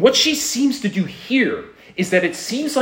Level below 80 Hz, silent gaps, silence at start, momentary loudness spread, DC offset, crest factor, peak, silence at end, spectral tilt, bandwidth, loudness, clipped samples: -60 dBFS; none; 0 s; 9 LU; under 0.1%; 18 dB; 0 dBFS; 0 s; -3.5 dB/octave; 16.5 kHz; -19 LUFS; under 0.1%